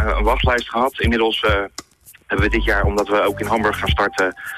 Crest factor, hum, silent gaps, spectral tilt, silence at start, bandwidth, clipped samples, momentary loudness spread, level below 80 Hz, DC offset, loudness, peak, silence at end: 12 dB; none; none; -5.5 dB/octave; 0 s; 14 kHz; under 0.1%; 4 LU; -26 dBFS; under 0.1%; -18 LUFS; -6 dBFS; 0 s